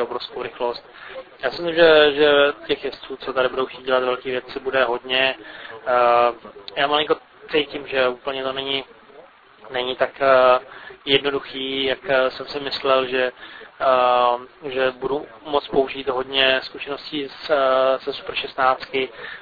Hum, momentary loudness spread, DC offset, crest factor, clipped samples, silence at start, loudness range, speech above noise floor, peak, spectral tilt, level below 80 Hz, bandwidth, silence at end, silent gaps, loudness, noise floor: none; 14 LU; under 0.1%; 20 dB; under 0.1%; 0 s; 4 LU; 26 dB; -2 dBFS; -6 dB/octave; -56 dBFS; 5 kHz; 0 s; none; -20 LUFS; -47 dBFS